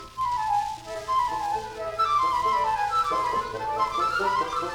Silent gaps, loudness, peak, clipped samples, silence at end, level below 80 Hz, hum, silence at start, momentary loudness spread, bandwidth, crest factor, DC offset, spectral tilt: none; -26 LUFS; -14 dBFS; under 0.1%; 0 s; -52 dBFS; none; 0 s; 7 LU; 19 kHz; 12 dB; under 0.1%; -3 dB/octave